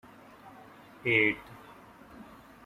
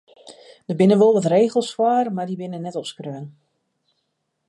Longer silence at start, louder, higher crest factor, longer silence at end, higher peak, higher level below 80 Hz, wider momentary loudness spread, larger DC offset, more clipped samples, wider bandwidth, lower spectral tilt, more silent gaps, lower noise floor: first, 0.45 s vs 0.25 s; second, -27 LUFS vs -19 LUFS; first, 24 dB vs 16 dB; second, 0.45 s vs 1.2 s; second, -12 dBFS vs -6 dBFS; first, -66 dBFS vs -72 dBFS; first, 27 LU vs 19 LU; neither; neither; first, 15.5 kHz vs 11.5 kHz; about the same, -6 dB/octave vs -7 dB/octave; neither; second, -53 dBFS vs -74 dBFS